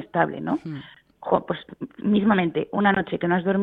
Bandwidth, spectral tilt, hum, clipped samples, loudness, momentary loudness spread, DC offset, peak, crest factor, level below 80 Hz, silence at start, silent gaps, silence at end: 4.1 kHz; -9.5 dB/octave; none; under 0.1%; -23 LUFS; 16 LU; under 0.1%; -4 dBFS; 18 dB; -58 dBFS; 0 s; none; 0 s